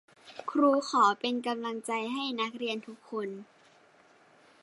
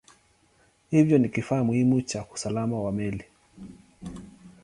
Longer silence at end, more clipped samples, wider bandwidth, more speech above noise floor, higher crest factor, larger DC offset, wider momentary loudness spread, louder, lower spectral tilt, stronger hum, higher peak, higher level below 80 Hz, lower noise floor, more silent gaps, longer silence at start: first, 1.2 s vs 0.15 s; neither; about the same, 11.5 kHz vs 11 kHz; second, 31 dB vs 39 dB; about the same, 20 dB vs 20 dB; neither; second, 15 LU vs 23 LU; second, -30 LUFS vs -25 LUFS; second, -3.5 dB/octave vs -7 dB/octave; neither; second, -12 dBFS vs -8 dBFS; second, -86 dBFS vs -56 dBFS; about the same, -61 dBFS vs -63 dBFS; neither; second, 0.25 s vs 0.9 s